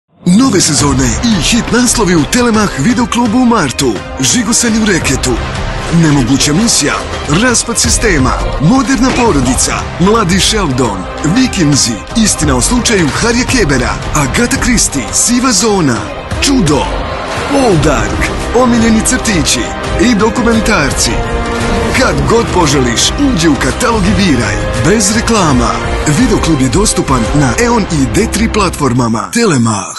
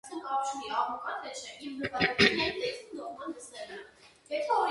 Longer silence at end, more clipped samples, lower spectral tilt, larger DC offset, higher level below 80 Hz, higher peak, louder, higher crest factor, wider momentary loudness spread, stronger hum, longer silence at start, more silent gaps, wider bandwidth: about the same, 0 s vs 0 s; neither; about the same, -4 dB/octave vs -3.5 dB/octave; neither; first, -22 dBFS vs -62 dBFS; first, 0 dBFS vs -8 dBFS; first, -10 LUFS vs -31 LUFS; second, 10 dB vs 24 dB; second, 5 LU vs 18 LU; neither; first, 0.25 s vs 0.05 s; neither; about the same, 12.5 kHz vs 11.5 kHz